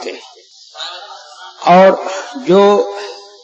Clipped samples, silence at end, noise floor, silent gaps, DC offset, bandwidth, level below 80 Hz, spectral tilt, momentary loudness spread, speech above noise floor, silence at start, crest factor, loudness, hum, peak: under 0.1%; 0.25 s; -41 dBFS; none; under 0.1%; 8 kHz; -66 dBFS; -5.5 dB/octave; 23 LU; 32 dB; 0 s; 14 dB; -11 LUFS; none; 0 dBFS